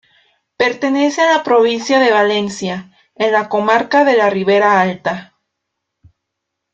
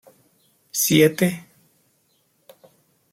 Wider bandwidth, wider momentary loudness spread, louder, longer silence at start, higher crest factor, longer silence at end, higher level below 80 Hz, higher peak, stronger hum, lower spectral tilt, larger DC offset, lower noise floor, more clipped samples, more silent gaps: second, 8.8 kHz vs 16.5 kHz; second, 11 LU vs 14 LU; first, -14 LUFS vs -19 LUFS; second, 0.6 s vs 0.75 s; second, 14 dB vs 20 dB; second, 1.5 s vs 1.7 s; about the same, -62 dBFS vs -62 dBFS; first, 0 dBFS vs -4 dBFS; neither; about the same, -4.5 dB/octave vs -4 dB/octave; neither; first, -77 dBFS vs -65 dBFS; neither; neither